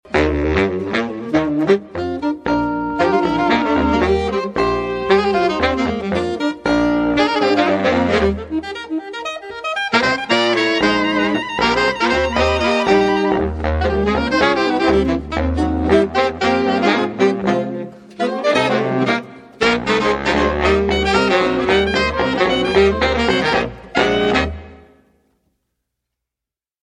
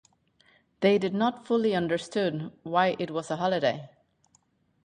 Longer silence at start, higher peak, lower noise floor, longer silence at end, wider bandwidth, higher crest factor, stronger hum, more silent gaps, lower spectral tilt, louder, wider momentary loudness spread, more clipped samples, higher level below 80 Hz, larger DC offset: second, 0.05 s vs 0.8 s; first, -2 dBFS vs -10 dBFS; first, -87 dBFS vs -68 dBFS; first, 2.15 s vs 0.95 s; about the same, 10 kHz vs 10.5 kHz; about the same, 16 dB vs 20 dB; neither; neither; about the same, -5.5 dB/octave vs -6 dB/octave; first, -17 LUFS vs -27 LUFS; about the same, 7 LU vs 7 LU; neither; first, -32 dBFS vs -70 dBFS; neither